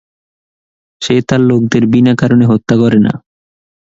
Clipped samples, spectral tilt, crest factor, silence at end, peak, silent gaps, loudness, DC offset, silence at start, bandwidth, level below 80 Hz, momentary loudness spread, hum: under 0.1%; -7 dB/octave; 12 dB; 0.7 s; 0 dBFS; none; -10 LUFS; under 0.1%; 1 s; 7.8 kHz; -46 dBFS; 6 LU; none